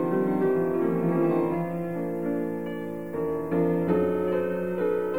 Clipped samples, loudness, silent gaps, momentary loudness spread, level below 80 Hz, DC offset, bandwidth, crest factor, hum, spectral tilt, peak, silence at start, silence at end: under 0.1%; -27 LUFS; none; 7 LU; -60 dBFS; 0.4%; 16.5 kHz; 14 dB; none; -9.5 dB/octave; -12 dBFS; 0 s; 0 s